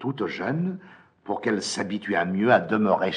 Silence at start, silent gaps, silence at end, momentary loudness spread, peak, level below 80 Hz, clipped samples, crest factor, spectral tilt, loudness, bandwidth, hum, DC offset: 0 s; none; 0 s; 11 LU; -6 dBFS; -70 dBFS; under 0.1%; 20 dB; -5.5 dB/octave; -25 LUFS; 10.5 kHz; none; under 0.1%